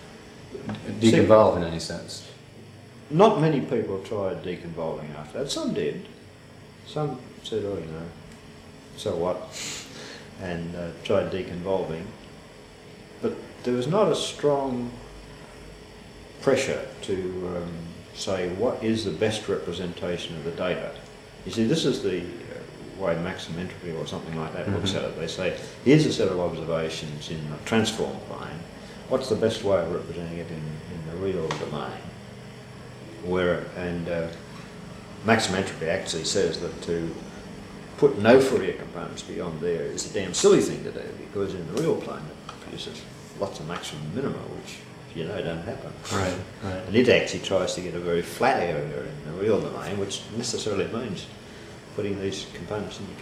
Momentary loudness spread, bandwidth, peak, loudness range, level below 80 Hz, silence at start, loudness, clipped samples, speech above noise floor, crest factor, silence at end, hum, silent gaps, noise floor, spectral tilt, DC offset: 20 LU; 14.5 kHz; -2 dBFS; 8 LU; -54 dBFS; 0 s; -27 LUFS; under 0.1%; 21 dB; 24 dB; 0 s; none; none; -47 dBFS; -5 dB/octave; under 0.1%